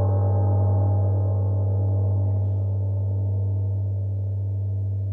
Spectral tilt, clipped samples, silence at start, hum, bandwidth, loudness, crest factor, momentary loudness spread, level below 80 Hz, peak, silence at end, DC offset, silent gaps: -13.5 dB/octave; under 0.1%; 0 s; none; 1.5 kHz; -24 LUFS; 10 dB; 6 LU; -58 dBFS; -12 dBFS; 0 s; under 0.1%; none